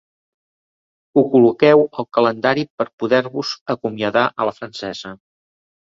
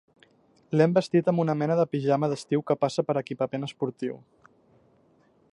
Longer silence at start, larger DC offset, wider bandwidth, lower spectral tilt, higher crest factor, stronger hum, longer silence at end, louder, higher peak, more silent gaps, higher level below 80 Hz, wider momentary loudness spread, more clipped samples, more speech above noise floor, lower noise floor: first, 1.15 s vs 0.7 s; neither; second, 7.6 kHz vs 11 kHz; second, -6 dB/octave vs -7.5 dB/octave; about the same, 18 dB vs 20 dB; neither; second, 0.8 s vs 1.35 s; first, -17 LUFS vs -26 LUFS; first, 0 dBFS vs -8 dBFS; first, 2.70-2.78 s, 2.93-2.98 s, 3.61-3.66 s vs none; first, -62 dBFS vs -72 dBFS; first, 15 LU vs 9 LU; neither; first, over 73 dB vs 37 dB; first, under -90 dBFS vs -63 dBFS